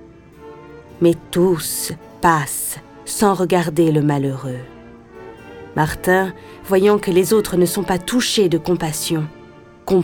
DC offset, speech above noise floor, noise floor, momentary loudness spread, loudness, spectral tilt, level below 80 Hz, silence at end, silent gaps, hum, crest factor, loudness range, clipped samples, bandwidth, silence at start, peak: under 0.1%; 23 dB; -41 dBFS; 18 LU; -18 LUFS; -5 dB/octave; -46 dBFS; 0 s; none; none; 18 dB; 3 LU; under 0.1%; 19 kHz; 0 s; 0 dBFS